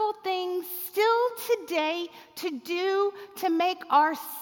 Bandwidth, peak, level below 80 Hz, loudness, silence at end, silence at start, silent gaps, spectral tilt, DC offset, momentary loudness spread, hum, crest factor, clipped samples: 17.5 kHz; -10 dBFS; -82 dBFS; -27 LUFS; 0 s; 0 s; none; -2 dB/octave; under 0.1%; 11 LU; none; 16 dB; under 0.1%